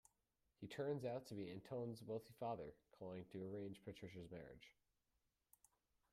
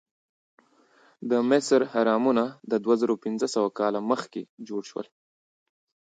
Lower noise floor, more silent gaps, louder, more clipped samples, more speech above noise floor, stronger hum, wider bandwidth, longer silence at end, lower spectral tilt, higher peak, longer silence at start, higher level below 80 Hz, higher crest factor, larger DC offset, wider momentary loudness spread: first, -88 dBFS vs -60 dBFS; second, none vs 4.49-4.57 s; second, -52 LUFS vs -25 LUFS; neither; about the same, 38 dB vs 35 dB; neither; first, 15 kHz vs 9.4 kHz; first, 1.4 s vs 1.1 s; first, -7 dB/octave vs -5 dB/octave; second, -34 dBFS vs -8 dBFS; second, 0.6 s vs 1.2 s; about the same, -80 dBFS vs -80 dBFS; about the same, 18 dB vs 18 dB; neither; second, 12 LU vs 16 LU